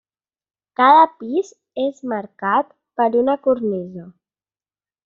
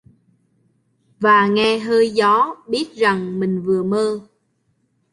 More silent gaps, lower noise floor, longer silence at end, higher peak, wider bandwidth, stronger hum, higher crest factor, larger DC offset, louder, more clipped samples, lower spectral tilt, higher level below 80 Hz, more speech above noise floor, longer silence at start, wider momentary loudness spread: neither; first, under -90 dBFS vs -66 dBFS; about the same, 0.95 s vs 0.9 s; about the same, -2 dBFS vs -2 dBFS; second, 7.4 kHz vs 11.5 kHz; neither; about the same, 18 dB vs 16 dB; neither; about the same, -18 LUFS vs -17 LUFS; neither; second, -3.5 dB/octave vs -5.5 dB/octave; about the same, -66 dBFS vs -62 dBFS; first, over 72 dB vs 49 dB; second, 0.8 s vs 1.2 s; first, 18 LU vs 9 LU